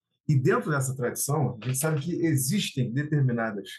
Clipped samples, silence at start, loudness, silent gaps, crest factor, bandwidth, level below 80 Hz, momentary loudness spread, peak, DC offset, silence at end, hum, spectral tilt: under 0.1%; 0.3 s; -27 LUFS; none; 14 dB; 12.5 kHz; -66 dBFS; 4 LU; -12 dBFS; under 0.1%; 0 s; none; -5.5 dB/octave